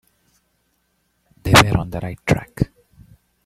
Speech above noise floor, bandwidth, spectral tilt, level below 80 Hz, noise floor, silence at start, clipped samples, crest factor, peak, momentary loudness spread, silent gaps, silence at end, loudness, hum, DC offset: 50 dB; 16 kHz; -4.5 dB/octave; -38 dBFS; -67 dBFS; 1.45 s; under 0.1%; 22 dB; 0 dBFS; 15 LU; none; 0.8 s; -18 LUFS; none; under 0.1%